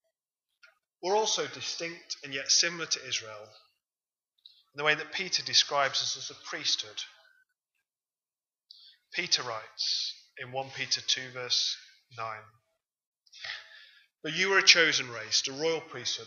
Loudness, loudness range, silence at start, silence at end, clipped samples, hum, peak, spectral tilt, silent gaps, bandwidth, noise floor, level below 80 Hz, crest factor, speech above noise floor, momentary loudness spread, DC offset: -28 LUFS; 7 LU; 1.05 s; 0 s; under 0.1%; none; -4 dBFS; -0.5 dB/octave; 13.07-13.13 s; 7.6 kHz; under -90 dBFS; -86 dBFS; 28 dB; over 60 dB; 16 LU; under 0.1%